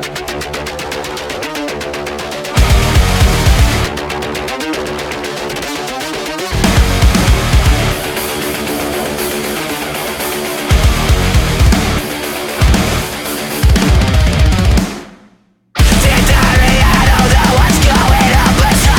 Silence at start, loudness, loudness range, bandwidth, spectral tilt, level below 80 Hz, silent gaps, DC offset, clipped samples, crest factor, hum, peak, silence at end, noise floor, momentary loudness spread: 0 s; -13 LUFS; 6 LU; 17.5 kHz; -4.5 dB/octave; -16 dBFS; none; under 0.1%; under 0.1%; 12 dB; none; 0 dBFS; 0 s; -49 dBFS; 11 LU